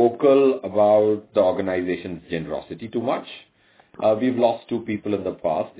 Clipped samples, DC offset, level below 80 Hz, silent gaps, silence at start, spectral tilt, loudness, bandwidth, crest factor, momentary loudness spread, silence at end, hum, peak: under 0.1%; under 0.1%; -56 dBFS; none; 0 s; -10.5 dB/octave; -22 LUFS; 4 kHz; 16 dB; 13 LU; 0.1 s; none; -6 dBFS